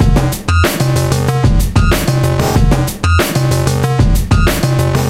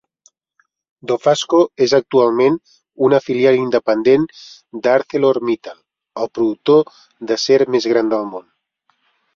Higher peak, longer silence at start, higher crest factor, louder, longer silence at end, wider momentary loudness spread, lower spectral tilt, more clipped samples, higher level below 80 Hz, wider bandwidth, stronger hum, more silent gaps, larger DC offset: about the same, 0 dBFS vs -2 dBFS; second, 0 s vs 1.05 s; about the same, 12 dB vs 16 dB; first, -13 LUFS vs -16 LUFS; second, 0 s vs 0.95 s; second, 2 LU vs 13 LU; about the same, -5.5 dB/octave vs -5 dB/octave; neither; first, -18 dBFS vs -62 dBFS; first, 16.5 kHz vs 7.8 kHz; neither; neither; first, 0.3% vs under 0.1%